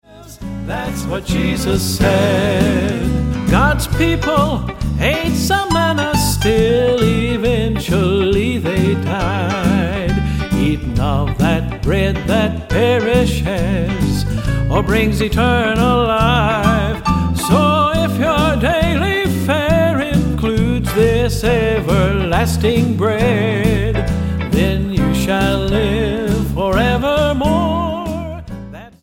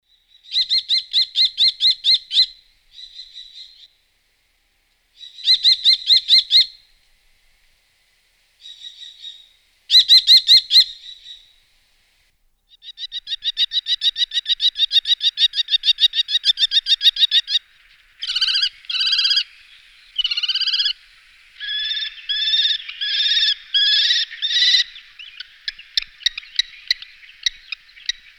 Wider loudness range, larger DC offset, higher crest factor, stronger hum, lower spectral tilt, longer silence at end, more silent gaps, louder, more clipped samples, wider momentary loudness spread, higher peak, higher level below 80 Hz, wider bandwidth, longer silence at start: second, 2 LU vs 8 LU; neither; about the same, 14 dB vs 18 dB; neither; first, -6 dB/octave vs 5.5 dB/octave; second, 0.15 s vs 0.9 s; neither; about the same, -16 LUFS vs -15 LUFS; neither; second, 5 LU vs 20 LU; first, 0 dBFS vs -4 dBFS; first, -24 dBFS vs -58 dBFS; about the same, 17 kHz vs 15.5 kHz; second, 0.1 s vs 0.5 s